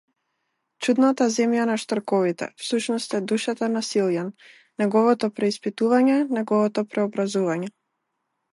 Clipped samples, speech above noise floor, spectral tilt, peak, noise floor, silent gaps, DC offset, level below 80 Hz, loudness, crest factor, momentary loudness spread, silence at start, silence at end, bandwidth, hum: under 0.1%; 55 dB; -5 dB/octave; -8 dBFS; -77 dBFS; none; under 0.1%; -76 dBFS; -23 LUFS; 16 dB; 8 LU; 0.8 s; 0.85 s; 11.5 kHz; none